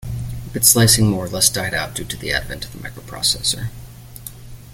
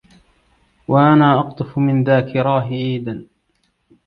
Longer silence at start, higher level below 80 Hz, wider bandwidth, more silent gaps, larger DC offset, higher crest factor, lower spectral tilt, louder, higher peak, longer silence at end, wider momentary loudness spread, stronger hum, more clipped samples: second, 0 s vs 0.9 s; first, -38 dBFS vs -54 dBFS; first, 17 kHz vs 5 kHz; neither; neither; about the same, 20 dB vs 18 dB; second, -3 dB/octave vs -10 dB/octave; about the same, -17 LUFS vs -16 LUFS; about the same, 0 dBFS vs 0 dBFS; second, 0 s vs 0.85 s; first, 23 LU vs 15 LU; neither; neither